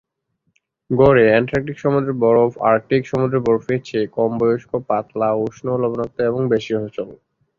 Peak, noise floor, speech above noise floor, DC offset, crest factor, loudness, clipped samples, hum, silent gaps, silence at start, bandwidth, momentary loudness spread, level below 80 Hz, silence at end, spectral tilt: -2 dBFS; -71 dBFS; 53 dB; under 0.1%; 16 dB; -18 LUFS; under 0.1%; none; none; 0.9 s; 7.2 kHz; 9 LU; -48 dBFS; 0.45 s; -8 dB/octave